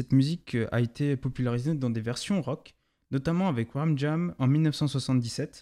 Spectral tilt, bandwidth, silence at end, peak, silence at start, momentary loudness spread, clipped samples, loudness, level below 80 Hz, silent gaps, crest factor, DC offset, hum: -7 dB/octave; 12.5 kHz; 0 s; -12 dBFS; 0 s; 7 LU; under 0.1%; -28 LUFS; -58 dBFS; none; 16 dB; under 0.1%; none